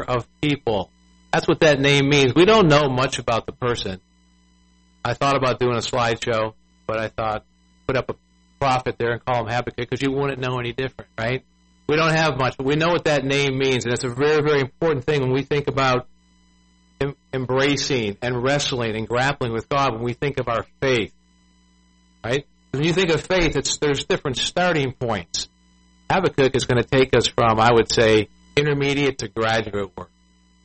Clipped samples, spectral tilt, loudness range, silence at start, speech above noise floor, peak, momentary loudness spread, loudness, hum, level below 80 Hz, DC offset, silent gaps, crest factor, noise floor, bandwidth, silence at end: under 0.1%; -5 dB/octave; 7 LU; 0 s; 37 dB; -4 dBFS; 12 LU; -21 LUFS; none; -44 dBFS; under 0.1%; none; 16 dB; -57 dBFS; 8.8 kHz; 0.6 s